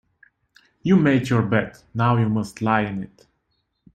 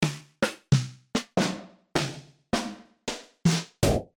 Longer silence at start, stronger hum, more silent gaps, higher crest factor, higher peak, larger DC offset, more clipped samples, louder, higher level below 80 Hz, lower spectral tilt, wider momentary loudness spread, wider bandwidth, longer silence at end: first, 0.85 s vs 0 s; neither; neither; about the same, 18 dB vs 20 dB; first, -4 dBFS vs -8 dBFS; neither; neither; first, -21 LUFS vs -29 LUFS; second, -54 dBFS vs -46 dBFS; first, -7.5 dB/octave vs -5 dB/octave; about the same, 13 LU vs 11 LU; second, 9.4 kHz vs 18.5 kHz; first, 0.9 s vs 0.15 s